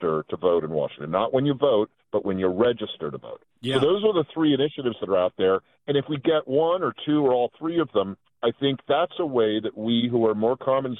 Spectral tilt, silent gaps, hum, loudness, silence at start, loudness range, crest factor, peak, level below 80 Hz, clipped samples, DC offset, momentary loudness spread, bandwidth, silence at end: -7.5 dB/octave; none; none; -24 LUFS; 0 s; 1 LU; 16 dB; -6 dBFS; -64 dBFS; under 0.1%; under 0.1%; 7 LU; 9.8 kHz; 0 s